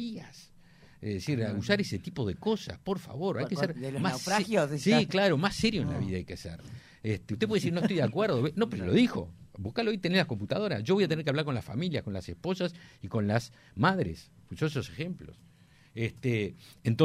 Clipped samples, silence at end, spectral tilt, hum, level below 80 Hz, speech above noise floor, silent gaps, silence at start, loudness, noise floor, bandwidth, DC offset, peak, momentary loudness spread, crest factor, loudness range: under 0.1%; 0 s; -6 dB/octave; none; -58 dBFS; 26 dB; none; 0 s; -30 LUFS; -56 dBFS; 15 kHz; under 0.1%; -10 dBFS; 14 LU; 20 dB; 5 LU